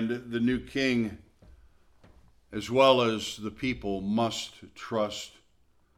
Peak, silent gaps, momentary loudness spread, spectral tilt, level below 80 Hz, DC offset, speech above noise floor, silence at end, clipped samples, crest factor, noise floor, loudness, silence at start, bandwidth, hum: -6 dBFS; none; 17 LU; -5 dB/octave; -56 dBFS; under 0.1%; 36 dB; 0.7 s; under 0.1%; 22 dB; -64 dBFS; -28 LUFS; 0 s; 15 kHz; none